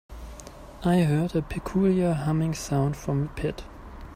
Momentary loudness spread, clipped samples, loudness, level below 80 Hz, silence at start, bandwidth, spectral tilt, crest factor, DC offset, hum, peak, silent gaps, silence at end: 21 LU; under 0.1%; -26 LUFS; -44 dBFS; 0.1 s; 15.5 kHz; -7 dB/octave; 16 dB; under 0.1%; none; -10 dBFS; none; 0 s